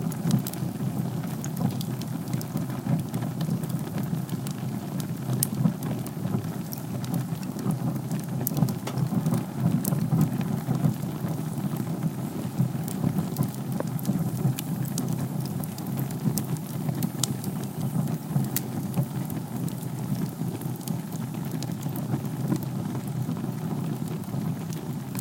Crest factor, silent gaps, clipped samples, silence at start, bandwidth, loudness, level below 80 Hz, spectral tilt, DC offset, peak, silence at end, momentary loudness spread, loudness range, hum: 28 dB; none; under 0.1%; 0 s; 17 kHz; -29 LUFS; -58 dBFS; -6.5 dB/octave; under 0.1%; 0 dBFS; 0 s; 6 LU; 4 LU; none